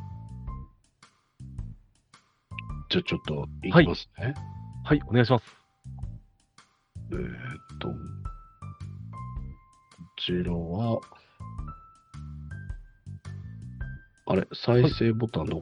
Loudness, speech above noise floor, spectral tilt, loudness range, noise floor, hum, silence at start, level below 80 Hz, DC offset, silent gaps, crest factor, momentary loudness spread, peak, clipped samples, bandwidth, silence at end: -28 LUFS; 36 dB; -8 dB/octave; 13 LU; -62 dBFS; none; 0 s; -46 dBFS; under 0.1%; none; 26 dB; 22 LU; -4 dBFS; under 0.1%; 10 kHz; 0 s